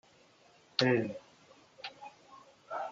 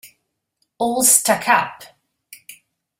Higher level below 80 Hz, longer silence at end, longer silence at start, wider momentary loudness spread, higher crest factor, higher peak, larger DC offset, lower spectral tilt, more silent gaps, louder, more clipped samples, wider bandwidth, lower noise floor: second, -82 dBFS vs -64 dBFS; second, 0 s vs 0.45 s; first, 0.8 s vs 0.05 s; first, 23 LU vs 12 LU; first, 28 dB vs 22 dB; second, -10 dBFS vs 0 dBFS; neither; first, -5.5 dB/octave vs -1 dB/octave; neither; second, -33 LUFS vs -15 LUFS; neither; second, 7.6 kHz vs 16.5 kHz; second, -63 dBFS vs -71 dBFS